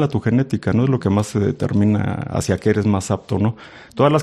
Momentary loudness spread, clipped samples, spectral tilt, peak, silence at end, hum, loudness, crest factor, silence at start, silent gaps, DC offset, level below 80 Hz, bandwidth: 5 LU; under 0.1%; -7 dB/octave; -2 dBFS; 0 s; none; -19 LUFS; 16 dB; 0 s; none; under 0.1%; -48 dBFS; 12.5 kHz